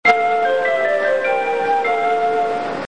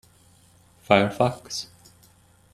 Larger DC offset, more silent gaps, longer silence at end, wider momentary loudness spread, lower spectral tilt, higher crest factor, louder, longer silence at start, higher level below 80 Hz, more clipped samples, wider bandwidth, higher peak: first, 0.7% vs under 0.1%; neither; second, 0 s vs 0.9 s; second, 2 LU vs 13 LU; about the same, -4 dB/octave vs -5 dB/octave; second, 16 dB vs 26 dB; first, -17 LUFS vs -23 LUFS; second, 0.05 s vs 0.9 s; about the same, -62 dBFS vs -60 dBFS; neither; second, 9.6 kHz vs 14.5 kHz; about the same, -2 dBFS vs -2 dBFS